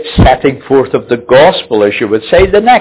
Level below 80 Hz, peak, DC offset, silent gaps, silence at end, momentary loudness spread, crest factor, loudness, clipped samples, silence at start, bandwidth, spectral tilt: -22 dBFS; 0 dBFS; under 0.1%; none; 0 s; 6 LU; 8 dB; -9 LUFS; 1%; 0 s; 4 kHz; -10 dB/octave